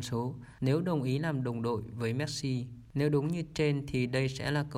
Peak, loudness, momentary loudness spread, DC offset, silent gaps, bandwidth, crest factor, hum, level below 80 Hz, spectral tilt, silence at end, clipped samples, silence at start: -16 dBFS; -32 LUFS; 6 LU; under 0.1%; none; 14.5 kHz; 14 dB; none; -56 dBFS; -6.5 dB/octave; 0 s; under 0.1%; 0 s